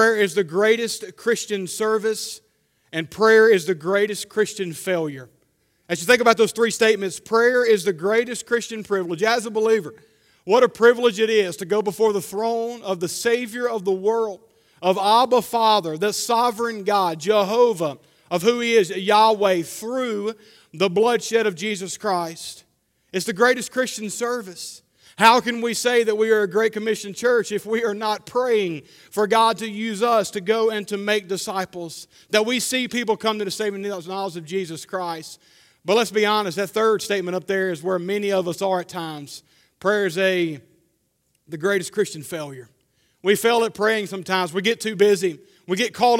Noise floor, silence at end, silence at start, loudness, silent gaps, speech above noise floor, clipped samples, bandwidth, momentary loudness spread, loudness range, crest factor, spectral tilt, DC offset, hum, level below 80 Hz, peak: -69 dBFS; 0 s; 0 s; -21 LUFS; none; 48 dB; under 0.1%; 16.5 kHz; 12 LU; 5 LU; 22 dB; -3.5 dB/octave; under 0.1%; none; -70 dBFS; 0 dBFS